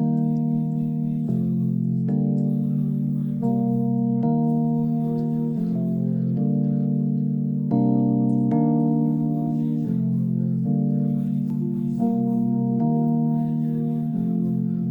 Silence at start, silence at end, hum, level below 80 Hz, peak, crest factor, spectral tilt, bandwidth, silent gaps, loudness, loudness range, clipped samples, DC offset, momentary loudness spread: 0 s; 0 s; none; -62 dBFS; -8 dBFS; 12 dB; -12.5 dB/octave; 1.8 kHz; none; -23 LUFS; 2 LU; under 0.1%; under 0.1%; 4 LU